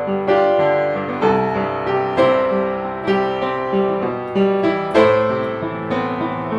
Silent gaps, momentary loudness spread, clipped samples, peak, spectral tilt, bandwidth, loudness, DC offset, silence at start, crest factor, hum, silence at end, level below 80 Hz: none; 7 LU; under 0.1%; -2 dBFS; -7.5 dB/octave; 9 kHz; -18 LUFS; under 0.1%; 0 s; 16 dB; none; 0 s; -52 dBFS